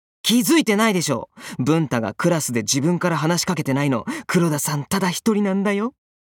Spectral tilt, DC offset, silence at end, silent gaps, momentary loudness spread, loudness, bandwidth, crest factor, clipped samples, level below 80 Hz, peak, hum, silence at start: -4.5 dB/octave; under 0.1%; 0.3 s; none; 7 LU; -20 LUFS; 18 kHz; 16 dB; under 0.1%; -60 dBFS; -4 dBFS; none; 0.25 s